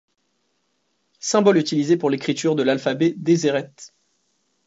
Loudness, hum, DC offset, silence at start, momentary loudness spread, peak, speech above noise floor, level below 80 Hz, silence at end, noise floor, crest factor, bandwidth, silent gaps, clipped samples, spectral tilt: -20 LUFS; none; under 0.1%; 1.25 s; 7 LU; -2 dBFS; 51 dB; -70 dBFS; 0.8 s; -70 dBFS; 18 dB; 8 kHz; none; under 0.1%; -5 dB/octave